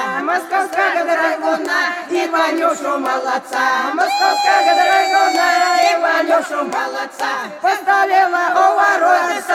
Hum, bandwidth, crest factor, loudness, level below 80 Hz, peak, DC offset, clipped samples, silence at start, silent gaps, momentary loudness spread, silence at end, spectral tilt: none; 15.5 kHz; 14 dB; -15 LUFS; -74 dBFS; -2 dBFS; under 0.1%; under 0.1%; 0 s; none; 7 LU; 0 s; -1.5 dB/octave